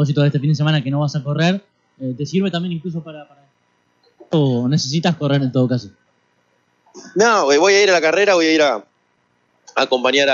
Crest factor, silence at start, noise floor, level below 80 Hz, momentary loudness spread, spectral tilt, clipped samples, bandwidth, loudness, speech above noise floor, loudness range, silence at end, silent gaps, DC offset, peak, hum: 16 dB; 0 s; -63 dBFS; -68 dBFS; 13 LU; -5 dB/octave; under 0.1%; 7.6 kHz; -17 LUFS; 47 dB; 7 LU; 0 s; none; under 0.1%; -2 dBFS; none